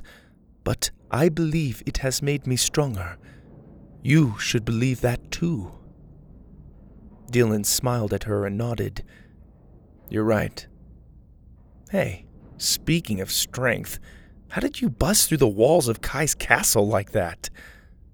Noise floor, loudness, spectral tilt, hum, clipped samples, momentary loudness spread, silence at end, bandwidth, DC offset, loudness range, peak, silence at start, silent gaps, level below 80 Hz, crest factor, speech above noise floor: -53 dBFS; -23 LUFS; -4.5 dB/octave; none; under 0.1%; 13 LU; 0.2 s; over 20 kHz; under 0.1%; 8 LU; 0 dBFS; 0 s; none; -42 dBFS; 24 dB; 30 dB